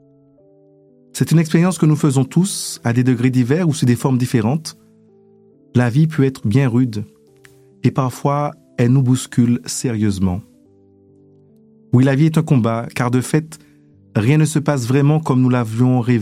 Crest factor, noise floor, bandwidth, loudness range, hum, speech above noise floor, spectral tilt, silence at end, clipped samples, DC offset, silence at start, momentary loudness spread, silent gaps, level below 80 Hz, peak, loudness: 14 dB; -51 dBFS; 15.5 kHz; 3 LU; none; 35 dB; -6.5 dB/octave; 0 s; under 0.1%; under 0.1%; 1.15 s; 7 LU; none; -54 dBFS; -2 dBFS; -17 LUFS